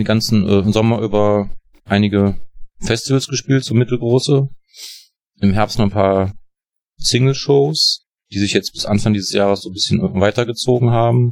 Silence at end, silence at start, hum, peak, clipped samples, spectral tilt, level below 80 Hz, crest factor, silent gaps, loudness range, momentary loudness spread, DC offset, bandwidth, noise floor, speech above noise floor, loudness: 0 s; 0 s; none; -2 dBFS; under 0.1%; -5.5 dB/octave; -40 dBFS; 14 dB; none; 2 LU; 10 LU; under 0.1%; 15 kHz; -73 dBFS; 58 dB; -16 LUFS